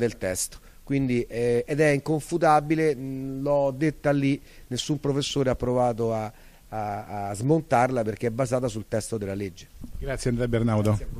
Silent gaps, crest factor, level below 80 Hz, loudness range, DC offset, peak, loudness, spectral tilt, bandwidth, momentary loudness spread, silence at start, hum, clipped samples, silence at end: none; 18 dB; -44 dBFS; 3 LU; under 0.1%; -8 dBFS; -26 LUFS; -6 dB/octave; 15 kHz; 10 LU; 0 s; none; under 0.1%; 0 s